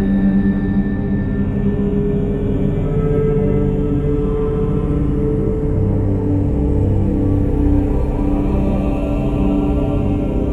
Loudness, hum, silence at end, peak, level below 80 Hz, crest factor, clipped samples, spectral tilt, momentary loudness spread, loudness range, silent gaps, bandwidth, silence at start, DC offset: -18 LUFS; none; 0 s; -4 dBFS; -22 dBFS; 12 dB; under 0.1%; -10.5 dB/octave; 3 LU; 1 LU; none; 4.1 kHz; 0 s; under 0.1%